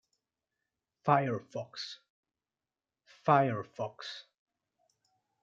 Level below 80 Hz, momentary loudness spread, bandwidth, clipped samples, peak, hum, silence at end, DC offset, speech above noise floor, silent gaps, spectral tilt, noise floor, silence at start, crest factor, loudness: -82 dBFS; 17 LU; 7.6 kHz; under 0.1%; -12 dBFS; none; 1.2 s; under 0.1%; over 59 dB; 2.10-2.23 s; -6.5 dB/octave; under -90 dBFS; 1.05 s; 24 dB; -32 LUFS